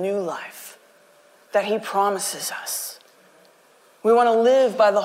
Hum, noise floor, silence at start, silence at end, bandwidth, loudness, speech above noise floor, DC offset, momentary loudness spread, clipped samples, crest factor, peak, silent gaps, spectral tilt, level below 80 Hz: none; -55 dBFS; 0 s; 0 s; 16 kHz; -21 LUFS; 35 dB; under 0.1%; 17 LU; under 0.1%; 14 dB; -8 dBFS; none; -3 dB/octave; -74 dBFS